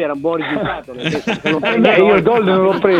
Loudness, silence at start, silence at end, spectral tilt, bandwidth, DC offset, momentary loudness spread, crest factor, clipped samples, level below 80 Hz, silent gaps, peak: -14 LUFS; 0 s; 0 s; -6.5 dB/octave; 9.4 kHz; under 0.1%; 10 LU; 14 dB; under 0.1%; -48 dBFS; none; 0 dBFS